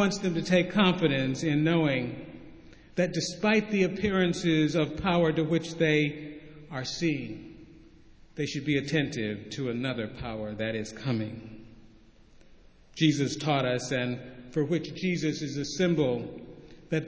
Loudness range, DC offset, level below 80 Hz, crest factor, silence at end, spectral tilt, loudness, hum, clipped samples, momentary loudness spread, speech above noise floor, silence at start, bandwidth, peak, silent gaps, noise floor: 6 LU; under 0.1%; -56 dBFS; 20 dB; 0 s; -5.5 dB/octave; -28 LUFS; none; under 0.1%; 16 LU; 28 dB; 0 s; 8 kHz; -10 dBFS; none; -55 dBFS